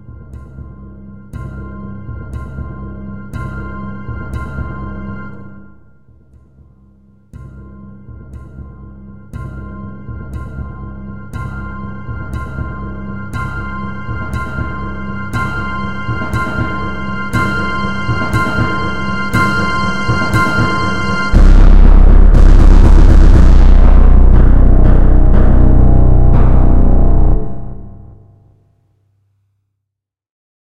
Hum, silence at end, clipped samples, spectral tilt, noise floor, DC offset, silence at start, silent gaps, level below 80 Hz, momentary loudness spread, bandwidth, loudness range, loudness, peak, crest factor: none; 0.35 s; 0.4%; -7.5 dB/octave; -79 dBFS; under 0.1%; 0 s; none; -12 dBFS; 24 LU; 6.6 kHz; 20 LU; -14 LUFS; 0 dBFS; 10 dB